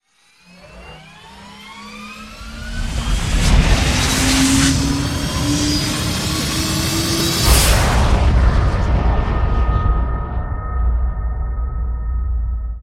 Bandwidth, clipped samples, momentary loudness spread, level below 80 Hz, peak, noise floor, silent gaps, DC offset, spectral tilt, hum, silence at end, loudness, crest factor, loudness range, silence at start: 16.5 kHz; under 0.1%; 19 LU; -20 dBFS; 0 dBFS; -52 dBFS; none; under 0.1%; -4 dB/octave; none; 0 s; -17 LUFS; 16 dB; 6 LU; 0.65 s